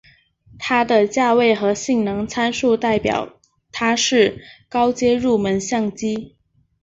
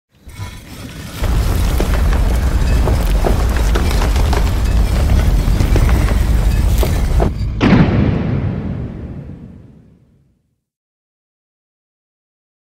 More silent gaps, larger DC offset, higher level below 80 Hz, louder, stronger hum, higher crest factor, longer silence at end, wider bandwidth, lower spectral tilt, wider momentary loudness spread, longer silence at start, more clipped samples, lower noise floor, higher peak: neither; neither; second, -52 dBFS vs -16 dBFS; about the same, -18 LUFS vs -16 LUFS; neither; about the same, 16 dB vs 14 dB; second, 0.55 s vs 3.2 s; second, 8 kHz vs 16 kHz; second, -4 dB/octave vs -6.5 dB/octave; second, 10 LU vs 16 LU; first, 0.55 s vs 0.25 s; neither; second, -51 dBFS vs -62 dBFS; second, -4 dBFS vs 0 dBFS